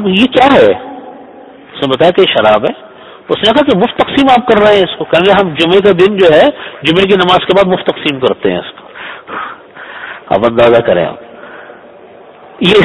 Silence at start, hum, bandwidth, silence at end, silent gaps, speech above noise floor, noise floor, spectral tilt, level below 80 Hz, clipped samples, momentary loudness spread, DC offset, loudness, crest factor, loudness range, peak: 0 s; none; 11 kHz; 0 s; none; 27 dB; -35 dBFS; -6 dB/octave; -42 dBFS; 0.9%; 20 LU; under 0.1%; -9 LUFS; 10 dB; 6 LU; 0 dBFS